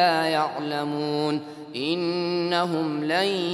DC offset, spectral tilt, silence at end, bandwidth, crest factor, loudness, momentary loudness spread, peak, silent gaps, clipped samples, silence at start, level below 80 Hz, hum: under 0.1%; -5.5 dB/octave; 0 s; 13.5 kHz; 18 dB; -25 LUFS; 5 LU; -8 dBFS; none; under 0.1%; 0 s; -76 dBFS; none